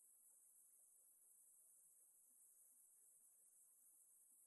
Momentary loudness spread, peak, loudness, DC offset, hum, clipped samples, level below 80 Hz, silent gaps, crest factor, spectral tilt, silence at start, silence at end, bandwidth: 1 LU; -58 dBFS; -69 LUFS; under 0.1%; none; under 0.1%; under -90 dBFS; none; 14 dB; 1 dB/octave; 0 s; 0 s; 12 kHz